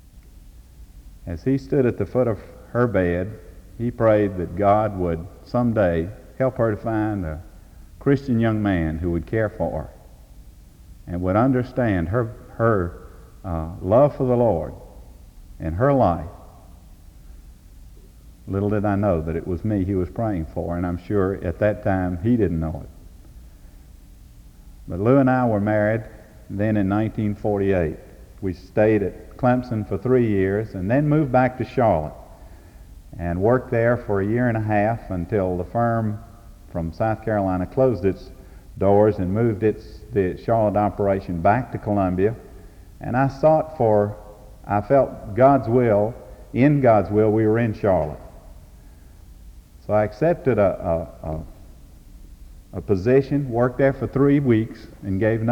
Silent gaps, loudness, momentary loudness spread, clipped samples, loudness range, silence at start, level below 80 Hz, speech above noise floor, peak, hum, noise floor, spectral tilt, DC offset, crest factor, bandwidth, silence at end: none; -21 LUFS; 13 LU; under 0.1%; 5 LU; 0.15 s; -42 dBFS; 25 dB; -4 dBFS; none; -45 dBFS; -9.5 dB/octave; under 0.1%; 18 dB; 17 kHz; 0 s